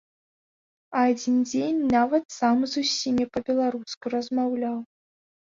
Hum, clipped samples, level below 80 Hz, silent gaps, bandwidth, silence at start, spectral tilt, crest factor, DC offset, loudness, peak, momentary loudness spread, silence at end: none; under 0.1%; -62 dBFS; 2.25-2.29 s, 3.97-4.01 s; 7.6 kHz; 0.9 s; -4 dB/octave; 18 dB; under 0.1%; -25 LUFS; -8 dBFS; 8 LU; 0.65 s